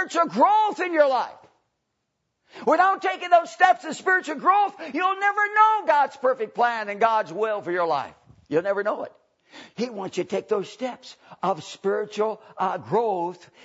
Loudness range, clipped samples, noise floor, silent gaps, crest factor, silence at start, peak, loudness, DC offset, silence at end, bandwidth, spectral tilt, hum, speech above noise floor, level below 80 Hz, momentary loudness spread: 8 LU; under 0.1%; -77 dBFS; none; 20 dB; 0 s; -4 dBFS; -23 LUFS; under 0.1%; 0.3 s; 8 kHz; -4.5 dB/octave; none; 54 dB; -76 dBFS; 12 LU